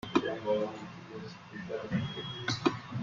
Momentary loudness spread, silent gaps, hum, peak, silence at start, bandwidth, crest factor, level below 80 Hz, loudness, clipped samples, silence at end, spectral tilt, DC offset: 13 LU; none; none; -12 dBFS; 0.05 s; 7.6 kHz; 22 dB; -64 dBFS; -35 LUFS; under 0.1%; 0 s; -5.5 dB/octave; under 0.1%